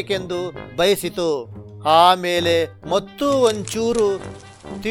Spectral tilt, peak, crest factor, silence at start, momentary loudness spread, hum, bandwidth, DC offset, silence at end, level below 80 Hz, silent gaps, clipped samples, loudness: -4 dB/octave; 0 dBFS; 20 dB; 0 s; 15 LU; none; 18 kHz; under 0.1%; 0 s; -50 dBFS; none; under 0.1%; -19 LUFS